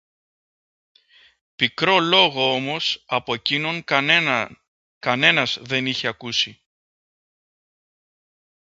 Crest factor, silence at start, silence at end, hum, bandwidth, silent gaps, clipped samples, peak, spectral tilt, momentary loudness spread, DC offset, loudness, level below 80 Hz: 24 dB; 1.6 s; 2.1 s; none; 8 kHz; 4.68-5.01 s; under 0.1%; 0 dBFS; -3.5 dB/octave; 9 LU; under 0.1%; -19 LUFS; -66 dBFS